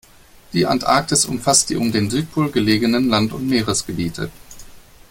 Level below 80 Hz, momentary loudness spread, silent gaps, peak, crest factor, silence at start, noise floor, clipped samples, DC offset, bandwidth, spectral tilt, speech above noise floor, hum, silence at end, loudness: -46 dBFS; 10 LU; none; -2 dBFS; 18 dB; 0.5 s; -46 dBFS; under 0.1%; under 0.1%; 17 kHz; -3.5 dB/octave; 28 dB; none; 0.3 s; -18 LUFS